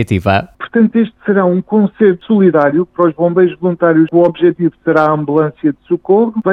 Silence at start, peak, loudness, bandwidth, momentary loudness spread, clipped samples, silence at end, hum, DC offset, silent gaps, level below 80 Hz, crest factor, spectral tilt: 0 s; 0 dBFS; -12 LUFS; 6.2 kHz; 6 LU; under 0.1%; 0 s; none; under 0.1%; none; -48 dBFS; 12 dB; -9 dB/octave